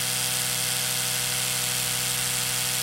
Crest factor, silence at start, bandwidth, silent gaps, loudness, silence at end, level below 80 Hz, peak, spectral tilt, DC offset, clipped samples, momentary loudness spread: 16 dB; 0 s; 16 kHz; none; -23 LUFS; 0 s; -56 dBFS; -10 dBFS; -0.5 dB/octave; under 0.1%; under 0.1%; 0 LU